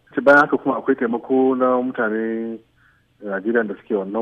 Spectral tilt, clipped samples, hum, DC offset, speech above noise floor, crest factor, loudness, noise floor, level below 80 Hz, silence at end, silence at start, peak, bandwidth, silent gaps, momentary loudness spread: -7.5 dB/octave; under 0.1%; none; under 0.1%; 39 dB; 16 dB; -19 LUFS; -58 dBFS; -64 dBFS; 0 s; 0.15 s; -4 dBFS; 7.4 kHz; none; 14 LU